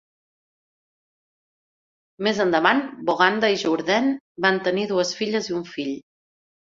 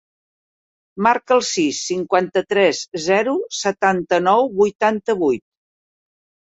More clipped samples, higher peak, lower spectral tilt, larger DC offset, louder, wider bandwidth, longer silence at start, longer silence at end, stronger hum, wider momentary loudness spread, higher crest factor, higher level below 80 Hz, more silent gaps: neither; about the same, 0 dBFS vs -2 dBFS; about the same, -4 dB/octave vs -4 dB/octave; neither; second, -22 LUFS vs -18 LUFS; about the same, 7.8 kHz vs 8.2 kHz; first, 2.2 s vs 0.95 s; second, 0.65 s vs 1.1 s; neither; first, 10 LU vs 5 LU; first, 24 dB vs 18 dB; second, -68 dBFS vs -62 dBFS; first, 4.20-4.35 s vs 4.75-4.79 s